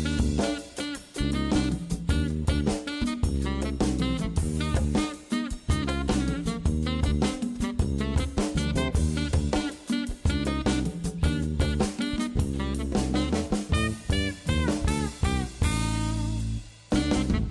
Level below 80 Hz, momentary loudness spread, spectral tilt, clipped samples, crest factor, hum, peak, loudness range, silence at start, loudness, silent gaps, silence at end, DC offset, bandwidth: -32 dBFS; 4 LU; -5.5 dB/octave; under 0.1%; 12 dB; none; -14 dBFS; 1 LU; 0 s; -28 LUFS; none; 0 s; under 0.1%; 12.5 kHz